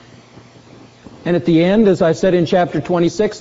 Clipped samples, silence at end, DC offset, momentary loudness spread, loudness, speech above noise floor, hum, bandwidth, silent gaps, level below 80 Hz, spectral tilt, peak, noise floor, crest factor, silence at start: under 0.1%; 0 s; under 0.1%; 6 LU; -15 LUFS; 29 dB; none; 8 kHz; none; -46 dBFS; -6 dB/octave; -2 dBFS; -42 dBFS; 14 dB; 1.25 s